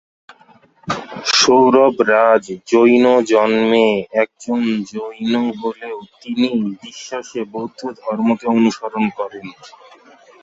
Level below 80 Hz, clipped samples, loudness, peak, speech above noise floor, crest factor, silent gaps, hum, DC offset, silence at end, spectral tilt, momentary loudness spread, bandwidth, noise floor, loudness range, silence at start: -60 dBFS; under 0.1%; -16 LUFS; -2 dBFS; 34 dB; 16 dB; none; none; under 0.1%; 0.75 s; -4 dB/octave; 16 LU; 8 kHz; -50 dBFS; 9 LU; 0.85 s